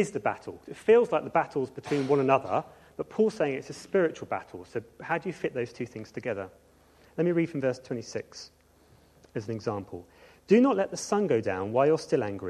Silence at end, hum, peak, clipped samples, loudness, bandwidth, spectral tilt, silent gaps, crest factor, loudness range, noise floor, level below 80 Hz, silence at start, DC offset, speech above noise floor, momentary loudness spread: 0 s; none; -10 dBFS; under 0.1%; -28 LUFS; 12 kHz; -6 dB/octave; none; 20 dB; 7 LU; -60 dBFS; -66 dBFS; 0 s; under 0.1%; 32 dB; 17 LU